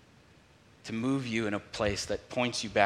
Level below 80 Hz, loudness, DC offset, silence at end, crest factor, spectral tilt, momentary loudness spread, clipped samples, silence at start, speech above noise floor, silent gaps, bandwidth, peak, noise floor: -56 dBFS; -32 LUFS; under 0.1%; 0 s; 26 dB; -4.5 dB/octave; 5 LU; under 0.1%; 0.85 s; 29 dB; none; 14 kHz; -8 dBFS; -59 dBFS